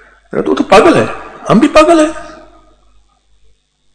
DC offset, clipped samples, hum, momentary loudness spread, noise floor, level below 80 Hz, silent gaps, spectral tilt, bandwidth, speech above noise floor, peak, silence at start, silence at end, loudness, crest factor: under 0.1%; 3%; 50 Hz at -45 dBFS; 15 LU; -49 dBFS; -36 dBFS; none; -5.5 dB/octave; 11 kHz; 41 dB; 0 dBFS; 0.35 s; 1.65 s; -9 LUFS; 12 dB